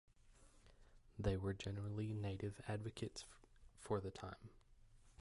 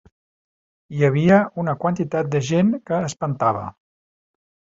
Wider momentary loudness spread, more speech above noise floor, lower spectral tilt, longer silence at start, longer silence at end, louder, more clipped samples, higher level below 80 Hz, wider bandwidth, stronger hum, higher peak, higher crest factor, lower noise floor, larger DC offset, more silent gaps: first, 17 LU vs 10 LU; second, 22 dB vs over 71 dB; about the same, -6.5 dB/octave vs -7 dB/octave; second, 0.25 s vs 0.9 s; second, 0.1 s vs 1 s; second, -46 LUFS vs -20 LUFS; neither; about the same, -60 dBFS vs -56 dBFS; first, 11.5 kHz vs 8 kHz; neither; second, -26 dBFS vs -2 dBFS; about the same, 22 dB vs 18 dB; second, -67 dBFS vs under -90 dBFS; neither; neither